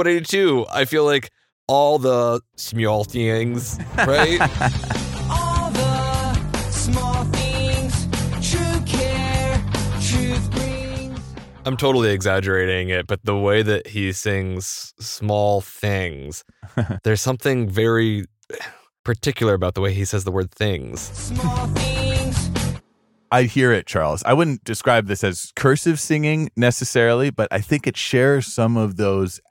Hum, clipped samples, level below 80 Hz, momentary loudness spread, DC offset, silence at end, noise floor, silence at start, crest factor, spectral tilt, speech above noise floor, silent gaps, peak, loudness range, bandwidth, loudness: none; under 0.1%; -34 dBFS; 10 LU; under 0.1%; 0.15 s; -62 dBFS; 0 s; 18 dB; -5 dB/octave; 42 dB; 1.52-1.67 s, 18.99-19.04 s; -2 dBFS; 4 LU; 17 kHz; -20 LUFS